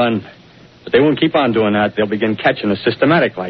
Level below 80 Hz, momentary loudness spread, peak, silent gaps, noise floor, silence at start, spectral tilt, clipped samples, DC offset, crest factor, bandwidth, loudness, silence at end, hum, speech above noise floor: -52 dBFS; 4 LU; 0 dBFS; none; -38 dBFS; 0 s; -4 dB/octave; under 0.1%; under 0.1%; 14 dB; 6 kHz; -15 LUFS; 0 s; none; 23 dB